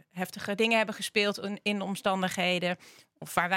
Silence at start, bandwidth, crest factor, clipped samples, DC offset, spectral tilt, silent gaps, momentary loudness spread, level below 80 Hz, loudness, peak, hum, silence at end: 0.15 s; 16.5 kHz; 22 dB; under 0.1%; under 0.1%; -4 dB/octave; none; 10 LU; -70 dBFS; -29 LUFS; -8 dBFS; none; 0 s